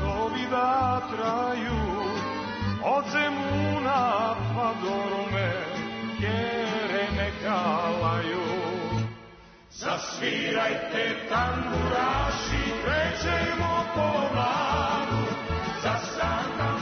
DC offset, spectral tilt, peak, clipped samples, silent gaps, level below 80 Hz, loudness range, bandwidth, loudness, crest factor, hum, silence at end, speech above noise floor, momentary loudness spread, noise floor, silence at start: under 0.1%; -5.5 dB/octave; -14 dBFS; under 0.1%; none; -44 dBFS; 2 LU; 6.6 kHz; -27 LUFS; 14 dB; none; 0 s; 23 dB; 5 LU; -50 dBFS; 0 s